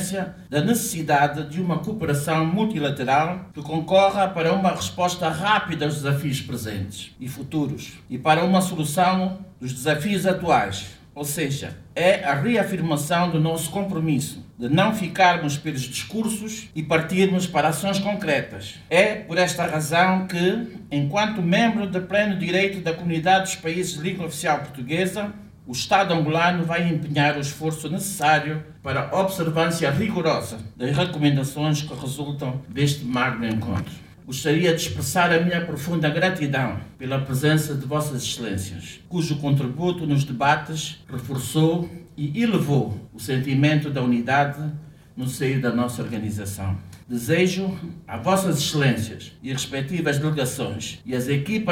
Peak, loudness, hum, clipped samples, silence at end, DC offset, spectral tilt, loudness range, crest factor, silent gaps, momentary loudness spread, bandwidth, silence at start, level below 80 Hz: -4 dBFS; -23 LUFS; none; under 0.1%; 0 s; under 0.1%; -5 dB/octave; 3 LU; 18 dB; none; 11 LU; 17.5 kHz; 0 s; -54 dBFS